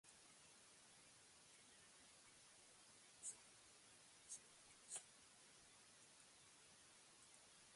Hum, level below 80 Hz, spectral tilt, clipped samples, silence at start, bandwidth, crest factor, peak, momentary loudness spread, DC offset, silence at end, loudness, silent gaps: none; under -90 dBFS; 0 dB/octave; under 0.1%; 0.05 s; 11.5 kHz; 28 dB; -38 dBFS; 11 LU; under 0.1%; 0 s; -62 LUFS; none